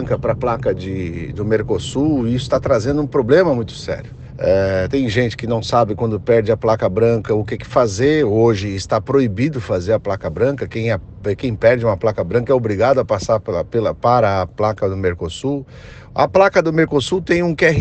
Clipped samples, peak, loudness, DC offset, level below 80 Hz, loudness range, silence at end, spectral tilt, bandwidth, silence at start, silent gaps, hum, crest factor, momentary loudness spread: under 0.1%; 0 dBFS; -17 LUFS; under 0.1%; -40 dBFS; 2 LU; 0 s; -6.5 dB/octave; 8.8 kHz; 0 s; none; none; 16 dB; 9 LU